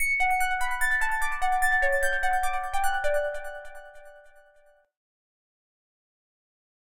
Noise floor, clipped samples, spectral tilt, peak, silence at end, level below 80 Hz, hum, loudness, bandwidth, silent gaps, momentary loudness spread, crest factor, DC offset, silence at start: -60 dBFS; under 0.1%; 0 dB/octave; -12 dBFS; 1.9 s; -40 dBFS; none; -26 LUFS; 16.5 kHz; none; 15 LU; 16 dB; 1%; 0 s